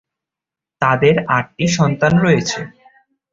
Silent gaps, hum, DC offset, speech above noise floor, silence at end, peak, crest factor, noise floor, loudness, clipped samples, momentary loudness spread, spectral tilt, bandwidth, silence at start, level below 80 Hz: none; none; under 0.1%; 72 dB; 0.65 s; 0 dBFS; 16 dB; -87 dBFS; -15 LUFS; under 0.1%; 10 LU; -5.5 dB/octave; 7.6 kHz; 0.8 s; -48 dBFS